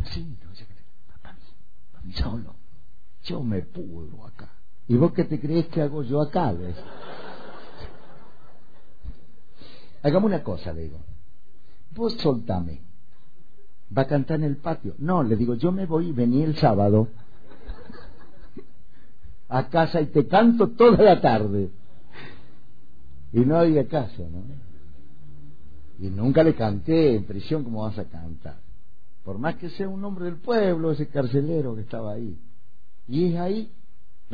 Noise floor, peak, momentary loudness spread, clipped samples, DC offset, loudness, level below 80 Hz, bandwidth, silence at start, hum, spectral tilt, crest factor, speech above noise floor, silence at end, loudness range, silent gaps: -61 dBFS; -4 dBFS; 24 LU; under 0.1%; 4%; -23 LUFS; -46 dBFS; 5 kHz; 0 s; none; -10 dB/octave; 20 dB; 38 dB; 0 s; 12 LU; none